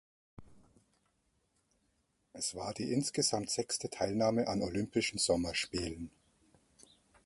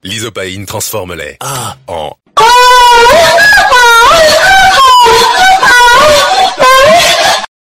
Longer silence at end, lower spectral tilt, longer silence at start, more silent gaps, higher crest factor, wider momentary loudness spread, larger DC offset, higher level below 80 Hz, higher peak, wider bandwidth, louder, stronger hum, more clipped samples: first, 1.15 s vs 0.15 s; first, -3.5 dB/octave vs -1 dB/octave; first, 0.4 s vs 0.05 s; neither; first, 20 dB vs 6 dB; second, 8 LU vs 16 LU; neither; second, -60 dBFS vs -32 dBFS; second, -18 dBFS vs 0 dBFS; second, 12 kHz vs 18 kHz; second, -34 LUFS vs -3 LUFS; neither; second, under 0.1% vs 1%